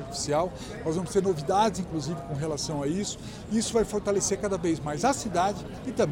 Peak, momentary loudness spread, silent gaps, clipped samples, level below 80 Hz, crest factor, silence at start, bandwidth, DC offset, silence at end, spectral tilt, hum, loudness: -12 dBFS; 7 LU; none; under 0.1%; -48 dBFS; 16 dB; 0 s; 17 kHz; under 0.1%; 0 s; -4.5 dB/octave; none; -28 LUFS